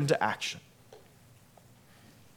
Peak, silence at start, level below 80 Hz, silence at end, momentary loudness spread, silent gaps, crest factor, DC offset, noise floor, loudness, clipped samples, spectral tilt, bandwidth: -12 dBFS; 0 s; -74 dBFS; 1.4 s; 27 LU; none; 24 dB; under 0.1%; -58 dBFS; -32 LUFS; under 0.1%; -4.5 dB/octave; 18.5 kHz